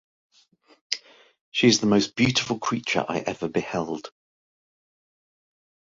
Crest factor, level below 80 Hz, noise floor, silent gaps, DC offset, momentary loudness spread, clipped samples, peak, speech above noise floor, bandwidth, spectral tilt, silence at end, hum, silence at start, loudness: 22 dB; -60 dBFS; -60 dBFS; 1.41-1.52 s; under 0.1%; 12 LU; under 0.1%; -6 dBFS; 36 dB; 7.8 kHz; -4 dB/octave; 1.85 s; none; 0.9 s; -24 LUFS